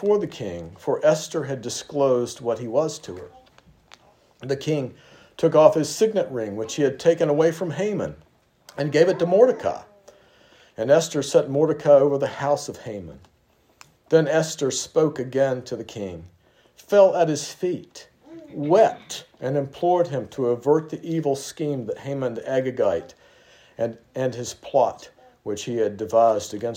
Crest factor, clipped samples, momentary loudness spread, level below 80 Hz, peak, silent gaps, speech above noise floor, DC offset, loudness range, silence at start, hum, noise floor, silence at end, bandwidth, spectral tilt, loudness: 22 dB; under 0.1%; 16 LU; -64 dBFS; 0 dBFS; none; 33 dB; under 0.1%; 6 LU; 0 s; none; -55 dBFS; 0 s; 16 kHz; -5.5 dB/octave; -22 LUFS